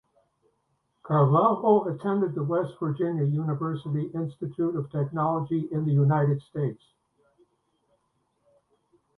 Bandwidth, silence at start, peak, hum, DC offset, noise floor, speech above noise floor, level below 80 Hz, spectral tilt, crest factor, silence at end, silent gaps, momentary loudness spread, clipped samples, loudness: 4 kHz; 1.05 s; -8 dBFS; none; under 0.1%; -74 dBFS; 48 dB; -68 dBFS; -11 dB/octave; 20 dB; 2.45 s; none; 9 LU; under 0.1%; -26 LUFS